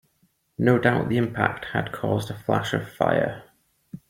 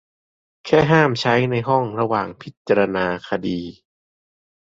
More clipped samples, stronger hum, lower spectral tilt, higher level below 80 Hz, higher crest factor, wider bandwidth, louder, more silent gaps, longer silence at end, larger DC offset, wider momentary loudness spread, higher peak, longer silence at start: neither; neither; about the same, -7 dB/octave vs -6.5 dB/octave; about the same, -56 dBFS vs -54 dBFS; about the same, 22 dB vs 18 dB; first, 16.5 kHz vs 7.8 kHz; second, -24 LUFS vs -19 LUFS; second, none vs 2.57-2.65 s; second, 0.1 s vs 1.05 s; neither; second, 9 LU vs 15 LU; about the same, -4 dBFS vs -2 dBFS; about the same, 0.6 s vs 0.65 s